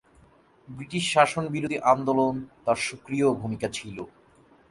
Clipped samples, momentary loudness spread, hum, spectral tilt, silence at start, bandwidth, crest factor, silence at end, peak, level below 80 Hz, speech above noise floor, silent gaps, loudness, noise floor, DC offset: under 0.1%; 18 LU; none; -5 dB/octave; 0.7 s; 11.5 kHz; 22 dB; 0.6 s; -6 dBFS; -60 dBFS; 32 dB; none; -25 LUFS; -58 dBFS; under 0.1%